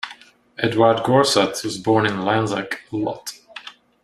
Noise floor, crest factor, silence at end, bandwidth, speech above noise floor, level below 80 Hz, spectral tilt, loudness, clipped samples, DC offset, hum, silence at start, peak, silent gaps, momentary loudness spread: -45 dBFS; 20 dB; 0.35 s; 14.5 kHz; 26 dB; -58 dBFS; -4.5 dB/octave; -19 LUFS; under 0.1%; under 0.1%; none; 0.05 s; -2 dBFS; none; 20 LU